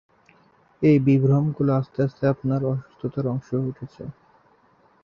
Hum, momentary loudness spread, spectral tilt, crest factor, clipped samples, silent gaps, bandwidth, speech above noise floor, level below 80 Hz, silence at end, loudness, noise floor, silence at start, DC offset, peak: none; 16 LU; -10.5 dB/octave; 16 dB; under 0.1%; none; 6.6 kHz; 37 dB; -58 dBFS; 0.9 s; -23 LUFS; -59 dBFS; 0.8 s; under 0.1%; -6 dBFS